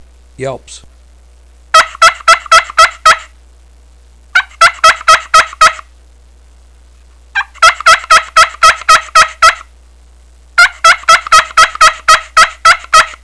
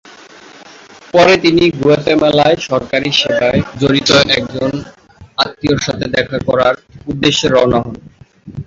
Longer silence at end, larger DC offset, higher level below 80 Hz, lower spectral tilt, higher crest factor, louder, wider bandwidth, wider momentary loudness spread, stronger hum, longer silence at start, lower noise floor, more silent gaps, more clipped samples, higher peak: about the same, 0.1 s vs 0.05 s; first, 0.4% vs under 0.1%; about the same, -36 dBFS vs -40 dBFS; second, 1 dB/octave vs -4.5 dB/octave; about the same, 10 dB vs 14 dB; first, -7 LUFS vs -12 LUFS; first, 11 kHz vs 7.8 kHz; about the same, 11 LU vs 10 LU; neither; second, 0.4 s vs 0.6 s; about the same, -40 dBFS vs -38 dBFS; neither; first, 4% vs under 0.1%; about the same, 0 dBFS vs 0 dBFS